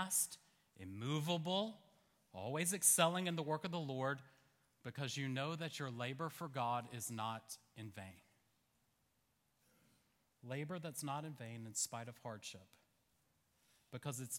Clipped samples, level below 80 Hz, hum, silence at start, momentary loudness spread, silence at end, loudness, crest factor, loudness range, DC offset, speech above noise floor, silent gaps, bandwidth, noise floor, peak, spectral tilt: under 0.1%; -86 dBFS; none; 0 s; 18 LU; 0 s; -41 LUFS; 26 dB; 13 LU; under 0.1%; 39 dB; none; 17 kHz; -81 dBFS; -18 dBFS; -3.5 dB/octave